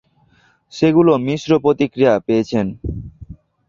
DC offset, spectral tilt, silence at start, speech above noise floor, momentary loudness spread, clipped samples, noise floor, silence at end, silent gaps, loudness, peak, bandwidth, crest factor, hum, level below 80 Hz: under 0.1%; -7 dB/octave; 0.75 s; 40 dB; 17 LU; under 0.1%; -56 dBFS; 0.35 s; none; -16 LUFS; -2 dBFS; 7.4 kHz; 16 dB; none; -40 dBFS